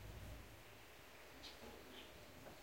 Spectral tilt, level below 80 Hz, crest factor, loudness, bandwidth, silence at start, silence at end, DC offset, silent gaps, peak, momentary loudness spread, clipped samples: -4 dB/octave; -64 dBFS; 14 dB; -58 LUFS; 16.5 kHz; 0 s; 0 s; under 0.1%; none; -42 dBFS; 5 LU; under 0.1%